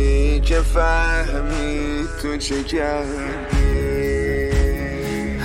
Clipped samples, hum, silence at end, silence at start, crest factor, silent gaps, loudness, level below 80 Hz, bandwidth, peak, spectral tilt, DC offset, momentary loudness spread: under 0.1%; none; 0 s; 0 s; 14 dB; none; -21 LUFS; -20 dBFS; 15.5 kHz; -4 dBFS; -5.5 dB/octave; under 0.1%; 6 LU